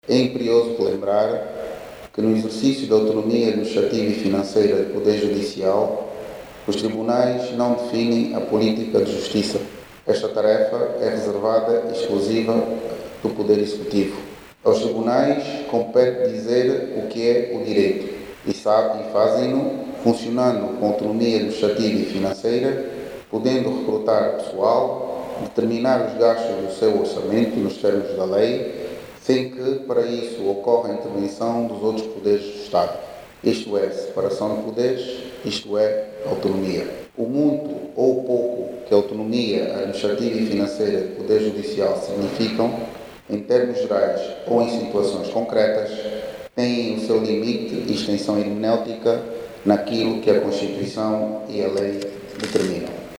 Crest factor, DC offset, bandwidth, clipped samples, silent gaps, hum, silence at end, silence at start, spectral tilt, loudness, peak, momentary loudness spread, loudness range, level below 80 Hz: 18 dB; under 0.1%; 16.5 kHz; under 0.1%; none; none; 0.05 s; 0.05 s; -6 dB/octave; -21 LUFS; -4 dBFS; 9 LU; 3 LU; -58 dBFS